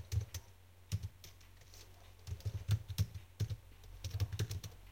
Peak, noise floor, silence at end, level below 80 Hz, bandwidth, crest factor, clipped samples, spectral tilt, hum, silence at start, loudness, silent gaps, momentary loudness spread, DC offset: -24 dBFS; -61 dBFS; 0 s; -56 dBFS; 16.5 kHz; 20 dB; under 0.1%; -5 dB/octave; none; 0 s; -43 LUFS; none; 19 LU; under 0.1%